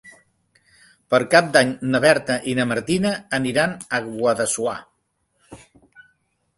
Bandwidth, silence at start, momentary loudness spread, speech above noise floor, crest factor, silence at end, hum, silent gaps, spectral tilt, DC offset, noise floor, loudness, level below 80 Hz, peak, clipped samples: 12 kHz; 0.05 s; 9 LU; 50 dB; 22 dB; 1 s; none; none; -4 dB/octave; under 0.1%; -70 dBFS; -20 LUFS; -58 dBFS; 0 dBFS; under 0.1%